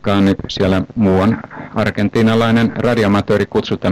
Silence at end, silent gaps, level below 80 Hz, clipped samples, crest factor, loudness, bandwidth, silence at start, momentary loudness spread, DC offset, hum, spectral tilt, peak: 0 s; none; -40 dBFS; under 0.1%; 8 dB; -15 LUFS; 13 kHz; 0.05 s; 5 LU; under 0.1%; none; -7 dB/octave; -6 dBFS